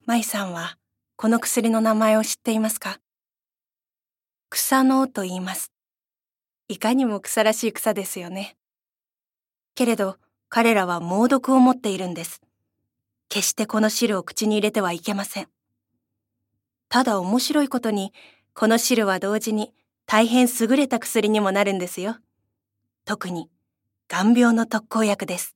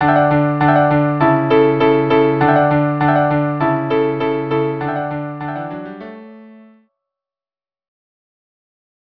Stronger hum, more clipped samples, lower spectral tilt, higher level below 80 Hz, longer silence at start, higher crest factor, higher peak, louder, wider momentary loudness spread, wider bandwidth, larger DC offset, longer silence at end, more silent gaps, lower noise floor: neither; neither; second, -4 dB/octave vs -10.5 dB/octave; second, -76 dBFS vs -50 dBFS; about the same, 0.05 s vs 0 s; first, 22 dB vs 16 dB; about the same, -2 dBFS vs 0 dBFS; second, -22 LUFS vs -15 LUFS; about the same, 14 LU vs 12 LU; first, 17 kHz vs 5.4 kHz; neither; second, 0.05 s vs 2.65 s; neither; about the same, under -90 dBFS vs under -90 dBFS